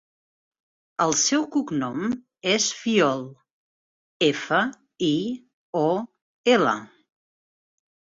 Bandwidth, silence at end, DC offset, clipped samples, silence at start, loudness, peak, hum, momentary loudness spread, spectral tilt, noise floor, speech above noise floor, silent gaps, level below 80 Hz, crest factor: 8 kHz; 1.25 s; under 0.1%; under 0.1%; 1 s; -23 LUFS; -6 dBFS; none; 11 LU; -3 dB/octave; under -90 dBFS; over 67 dB; 3.51-4.20 s, 5.54-5.73 s, 6.22-6.44 s; -66 dBFS; 20 dB